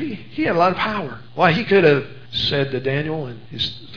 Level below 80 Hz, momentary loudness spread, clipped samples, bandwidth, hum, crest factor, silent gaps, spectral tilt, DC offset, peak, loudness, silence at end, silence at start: -50 dBFS; 13 LU; under 0.1%; 5.4 kHz; none; 20 dB; none; -7 dB/octave; 1%; 0 dBFS; -19 LUFS; 0 s; 0 s